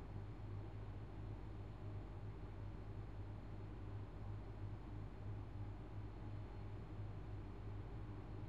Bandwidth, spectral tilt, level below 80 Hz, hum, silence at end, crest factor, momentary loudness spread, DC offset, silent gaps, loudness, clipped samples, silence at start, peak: 7.2 kHz; -9 dB/octave; -56 dBFS; none; 0 s; 14 dB; 1 LU; 0.1%; none; -52 LUFS; under 0.1%; 0 s; -36 dBFS